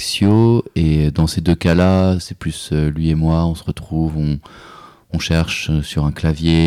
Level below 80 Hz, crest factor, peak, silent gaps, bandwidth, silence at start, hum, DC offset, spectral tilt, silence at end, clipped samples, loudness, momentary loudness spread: -28 dBFS; 12 dB; -4 dBFS; none; 14 kHz; 0 s; none; under 0.1%; -6.5 dB/octave; 0 s; under 0.1%; -17 LUFS; 10 LU